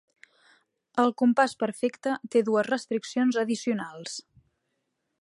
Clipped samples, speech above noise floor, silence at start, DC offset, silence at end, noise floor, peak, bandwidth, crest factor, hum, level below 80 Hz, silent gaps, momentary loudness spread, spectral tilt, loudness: under 0.1%; 53 dB; 0.95 s; under 0.1%; 1 s; -79 dBFS; -8 dBFS; 11.5 kHz; 20 dB; none; -78 dBFS; none; 12 LU; -4.5 dB/octave; -27 LUFS